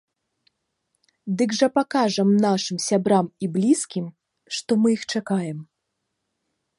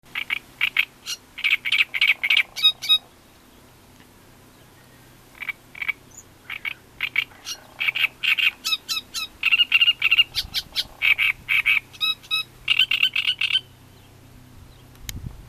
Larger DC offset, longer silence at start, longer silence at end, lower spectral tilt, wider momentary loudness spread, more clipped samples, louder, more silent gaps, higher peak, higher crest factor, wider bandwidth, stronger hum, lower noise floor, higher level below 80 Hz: neither; first, 1.25 s vs 0.15 s; first, 1.15 s vs 0.05 s; first, -5 dB/octave vs 0.5 dB/octave; second, 12 LU vs 16 LU; neither; about the same, -22 LUFS vs -20 LUFS; neither; about the same, -6 dBFS vs -4 dBFS; about the same, 18 dB vs 22 dB; second, 11.5 kHz vs 14.5 kHz; neither; first, -78 dBFS vs -51 dBFS; second, -72 dBFS vs -52 dBFS